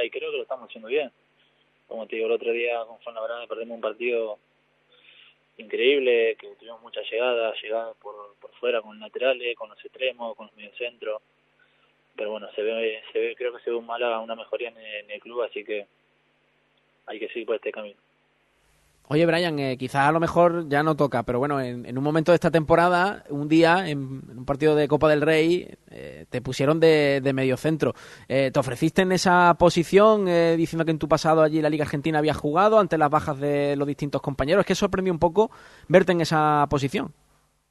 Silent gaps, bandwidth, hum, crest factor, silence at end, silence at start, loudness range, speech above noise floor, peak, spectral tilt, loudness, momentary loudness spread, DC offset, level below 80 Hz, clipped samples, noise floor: none; 12.5 kHz; none; 22 dB; 0.6 s; 0 s; 12 LU; 43 dB; -2 dBFS; -6 dB/octave; -23 LUFS; 17 LU; under 0.1%; -52 dBFS; under 0.1%; -66 dBFS